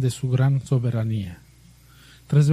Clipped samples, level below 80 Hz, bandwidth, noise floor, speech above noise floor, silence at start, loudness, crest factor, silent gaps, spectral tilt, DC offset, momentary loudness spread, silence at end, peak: under 0.1%; -52 dBFS; 12.5 kHz; -51 dBFS; 29 dB; 0 s; -23 LUFS; 16 dB; none; -7.5 dB/octave; under 0.1%; 8 LU; 0 s; -6 dBFS